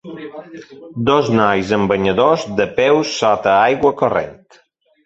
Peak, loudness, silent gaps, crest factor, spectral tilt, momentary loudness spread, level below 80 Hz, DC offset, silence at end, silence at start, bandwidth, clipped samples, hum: -2 dBFS; -15 LUFS; none; 16 dB; -5.5 dB/octave; 19 LU; -48 dBFS; under 0.1%; 0.7 s; 0.05 s; 8 kHz; under 0.1%; none